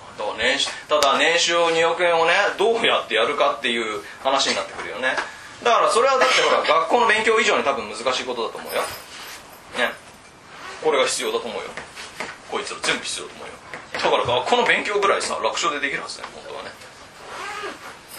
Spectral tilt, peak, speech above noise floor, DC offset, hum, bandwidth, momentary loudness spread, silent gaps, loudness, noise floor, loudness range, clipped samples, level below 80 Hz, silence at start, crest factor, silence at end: -1.5 dB/octave; 0 dBFS; 24 dB; under 0.1%; none; 13.5 kHz; 19 LU; none; -20 LUFS; -45 dBFS; 7 LU; under 0.1%; -60 dBFS; 0 s; 22 dB; 0 s